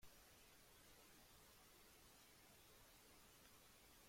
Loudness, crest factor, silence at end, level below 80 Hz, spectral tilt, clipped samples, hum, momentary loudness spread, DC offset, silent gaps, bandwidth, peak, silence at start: -67 LUFS; 16 dB; 0 s; -78 dBFS; -2 dB/octave; under 0.1%; none; 1 LU; under 0.1%; none; 16.5 kHz; -52 dBFS; 0 s